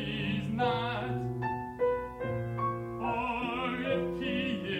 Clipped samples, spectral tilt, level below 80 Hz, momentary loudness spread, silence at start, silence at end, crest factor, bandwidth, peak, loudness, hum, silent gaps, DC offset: under 0.1%; -7.5 dB/octave; -54 dBFS; 4 LU; 0 s; 0 s; 14 dB; 15 kHz; -18 dBFS; -33 LUFS; none; none; under 0.1%